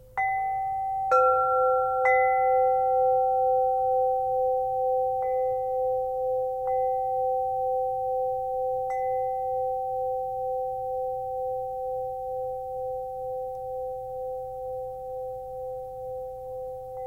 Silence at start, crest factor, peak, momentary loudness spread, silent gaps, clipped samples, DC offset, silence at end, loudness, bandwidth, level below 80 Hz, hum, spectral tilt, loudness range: 0 s; 16 dB; -10 dBFS; 13 LU; none; under 0.1%; under 0.1%; 0 s; -27 LUFS; 15 kHz; -56 dBFS; none; -5.5 dB/octave; 11 LU